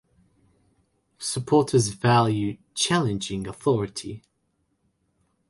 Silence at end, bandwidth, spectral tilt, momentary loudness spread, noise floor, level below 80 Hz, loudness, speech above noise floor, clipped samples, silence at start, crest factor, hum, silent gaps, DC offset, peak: 1.3 s; 11.5 kHz; -5 dB/octave; 13 LU; -72 dBFS; -56 dBFS; -24 LUFS; 49 dB; under 0.1%; 1.2 s; 18 dB; none; none; under 0.1%; -8 dBFS